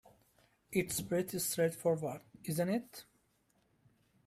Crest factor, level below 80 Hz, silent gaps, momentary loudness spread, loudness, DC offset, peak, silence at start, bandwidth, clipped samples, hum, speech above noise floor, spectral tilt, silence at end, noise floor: 20 dB; -70 dBFS; none; 11 LU; -36 LUFS; under 0.1%; -18 dBFS; 0.7 s; 16 kHz; under 0.1%; none; 39 dB; -4.5 dB/octave; 1.25 s; -75 dBFS